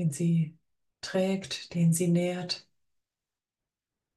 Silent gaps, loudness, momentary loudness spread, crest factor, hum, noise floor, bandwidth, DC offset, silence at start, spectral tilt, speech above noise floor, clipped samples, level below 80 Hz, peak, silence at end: none; -29 LUFS; 10 LU; 14 dB; none; under -90 dBFS; 12.5 kHz; under 0.1%; 0 s; -6 dB/octave; over 62 dB; under 0.1%; -72 dBFS; -16 dBFS; 1.55 s